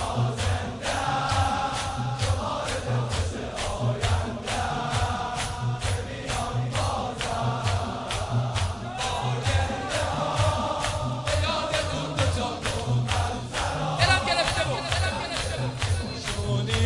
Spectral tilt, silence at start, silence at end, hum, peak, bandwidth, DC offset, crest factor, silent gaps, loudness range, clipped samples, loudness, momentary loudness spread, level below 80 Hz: -4.5 dB/octave; 0 s; 0 s; none; -8 dBFS; 11.5 kHz; under 0.1%; 20 dB; none; 3 LU; under 0.1%; -27 LUFS; 5 LU; -40 dBFS